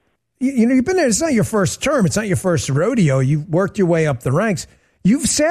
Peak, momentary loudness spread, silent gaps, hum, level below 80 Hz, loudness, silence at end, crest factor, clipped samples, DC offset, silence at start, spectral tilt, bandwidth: -6 dBFS; 6 LU; none; none; -44 dBFS; -17 LUFS; 0 s; 12 dB; under 0.1%; under 0.1%; 0.4 s; -5.5 dB/octave; 13.5 kHz